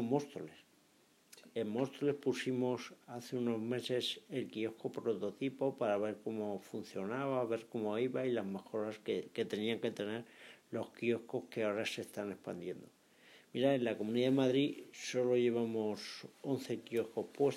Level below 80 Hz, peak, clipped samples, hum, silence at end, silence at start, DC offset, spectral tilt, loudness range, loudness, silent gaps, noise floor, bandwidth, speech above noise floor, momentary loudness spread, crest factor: under -90 dBFS; -20 dBFS; under 0.1%; none; 0 s; 0 s; under 0.1%; -5.5 dB/octave; 5 LU; -38 LUFS; none; -70 dBFS; 15.5 kHz; 32 dB; 12 LU; 18 dB